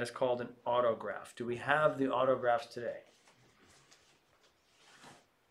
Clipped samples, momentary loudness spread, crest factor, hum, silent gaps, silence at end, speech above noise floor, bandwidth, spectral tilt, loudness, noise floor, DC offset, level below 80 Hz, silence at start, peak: under 0.1%; 12 LU; 24 dB; none; none; 0.35 s; 36 dB; 12.5 kHz; -5.5 dB/octave; -34 LUFS; -70 dBFS; under 0.1%; -76 dBFS; 0 s; -12 dBFS